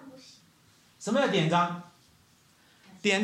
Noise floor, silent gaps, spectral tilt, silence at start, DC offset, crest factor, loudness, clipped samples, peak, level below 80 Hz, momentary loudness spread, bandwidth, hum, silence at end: -62 dBFS; none; -5 dB/octave; 0 s; under 0.1%; 20 dB; -27 LUFS; under 0.1%; -12 dBFS; -76 dBFS; 17 LU; 13 kHz; none; 0 s